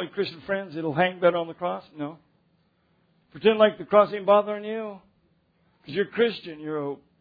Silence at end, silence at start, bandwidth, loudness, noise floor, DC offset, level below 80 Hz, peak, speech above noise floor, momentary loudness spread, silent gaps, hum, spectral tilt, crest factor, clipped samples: 0.25 s; 0 s; 5 kHz; -25 LUFS; -67 dBFS; under 0.1%; -70 dBFS; -6 dBFS; 42 dB; 15 LU; none; none; -8.5 dB/octave; 20 dB; under 0.1%